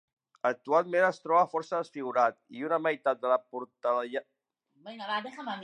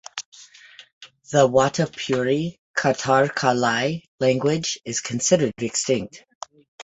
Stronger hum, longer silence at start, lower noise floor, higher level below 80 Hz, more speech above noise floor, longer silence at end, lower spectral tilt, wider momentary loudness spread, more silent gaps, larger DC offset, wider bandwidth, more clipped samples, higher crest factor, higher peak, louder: neither; first, 0.45 s vs 0.15 s; first, -71 dBFS vs -48 dBFS; second, -88 dBFS vs -60 dBFS; first, 41 dB vs 27 dB; about the same, 0 s vs 0 s; about the same, -5 dB/octave vs -4 dB/octave; second, 12 LU vs 17 LU; second, none vs 0.25-0.32 s, 0.93-1.01 s, 2.59-2.74 s, 4.08-4.18 s, 6.35-6.41 s, 6.68-6.78 s; neither; first, 9.8 kHz vs 8.2 kHz; neither; about the same, 20 dB vs 20 dB; second, -12 dBFS vs -2 dBFS; second, -30 LUFS vs -21 LUFS